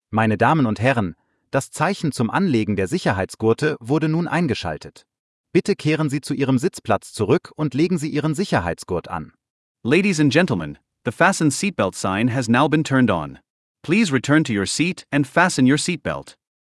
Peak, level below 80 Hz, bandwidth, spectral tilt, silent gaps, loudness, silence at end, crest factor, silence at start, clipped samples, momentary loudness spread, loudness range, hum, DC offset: -2 dBFS; -54 dBFS; 12 kHz; -5.5 dB/octave; 5.19-5.44 s, 9.50-9.75 s, 13.50-13.75 s; -20 LUFS; 0.35 s; 18 dB; 0.1 s; under 0.1%; 10 LU; 3 LU; none; under 0.1%